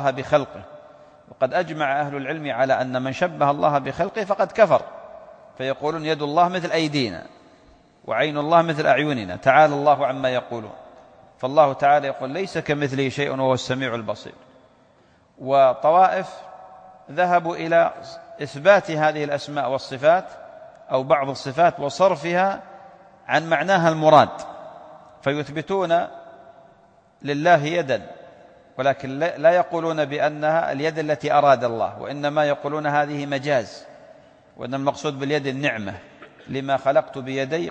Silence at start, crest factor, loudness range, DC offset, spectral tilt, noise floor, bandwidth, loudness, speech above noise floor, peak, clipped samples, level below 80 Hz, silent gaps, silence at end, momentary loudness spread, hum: 0 s; 20 dB; 5 LU; under 0.1%; -5.5 dB/octave; -56 dBFS; 9 kHz; -21 LUFS; 36 dB; -2 dBFS; under 0.1%; -62 dBFS; none; 0 s; 17 LU; none